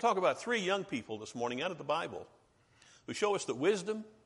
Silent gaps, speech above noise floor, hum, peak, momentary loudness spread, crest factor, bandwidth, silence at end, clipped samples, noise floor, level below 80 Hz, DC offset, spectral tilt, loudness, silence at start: none; 32 dB; none; -16 dBFS; 11 LU; 20 dB; 11.5 kHz; 0.15 s; under 0.1%; -66 dBFS; -76 dBFS; under 0.1%; -4 dB/octave; -35 LUFS; 0 s